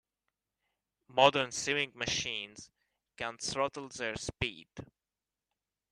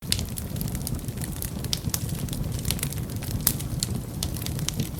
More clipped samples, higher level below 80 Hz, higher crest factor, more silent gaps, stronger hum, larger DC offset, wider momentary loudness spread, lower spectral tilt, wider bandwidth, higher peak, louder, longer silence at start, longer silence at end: neither; second, -62 dBFS vs -38 dBFS; about the same, 30 dB vs 30 dB; neither; neither; neither; first, 21 LU vs 7 LU; second, -2.5 dB/octave vs -4 dB/octave; second, 12.5 kHz vs 18 kHz; second, -6 dBFS vs 0 dBFS; second, -32 LUFS vs -29 LUFS; first, 1.15 s vs 0 s; first, 1.1 s vs 0 s